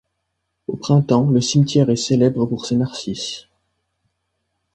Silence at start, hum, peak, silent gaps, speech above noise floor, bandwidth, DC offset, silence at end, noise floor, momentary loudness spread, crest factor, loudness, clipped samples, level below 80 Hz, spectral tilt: 0.7 s; none; -2 dBFS; none; 57 dB; 9.4 kHz; under 0.1%; 1.35 s; -74 dBFS; 13 LU; 18 dB; -18 LUFS; under 0.1%; -54 dBFS; -6.5 dB/octave